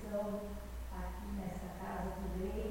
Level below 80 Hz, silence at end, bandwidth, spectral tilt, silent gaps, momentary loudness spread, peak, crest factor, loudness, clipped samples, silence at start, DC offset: -46 dBFS; 0 s; 16.5 kHz; -7 dB/octave; none; 6 LU; -28 dBFS; 12 dB; -43 LUFS; under 0.1%; 0 s; under 0.1%